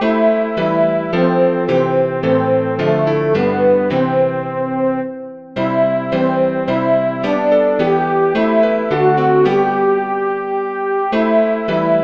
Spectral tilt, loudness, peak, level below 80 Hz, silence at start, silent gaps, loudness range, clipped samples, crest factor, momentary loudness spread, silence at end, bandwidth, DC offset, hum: -8.5 dB/octave; -15 LUFS; -2 dBFS; -52 dBFS; 0 s; none; 2 LU; under 0.1%; 12 dB; 5 LU; 0 s; 6.8 kHz; 0.3%; none